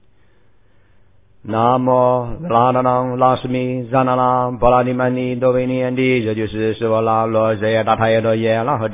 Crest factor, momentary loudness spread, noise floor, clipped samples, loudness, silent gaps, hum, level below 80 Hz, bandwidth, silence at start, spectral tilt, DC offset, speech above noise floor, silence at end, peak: 16 dB; 5 LU; -56 dBFS; under 0.1%; -16 LUFS; none; none; -44 dBFS; 3.8 kHz; 1.45 s; -11 dB/octave; 0.3%; 40 dB; 0 s; 0 dBFS